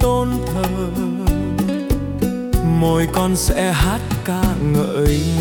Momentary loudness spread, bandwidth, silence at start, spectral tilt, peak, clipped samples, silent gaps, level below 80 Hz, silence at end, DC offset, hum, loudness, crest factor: 5 LU; 18 kHz; 0 s; -6 dB/octave; -4 dBFS; under 0.1%; none; -24 dBFS; 0 s; under 0.1%; none; -19 LUFS; 14 dB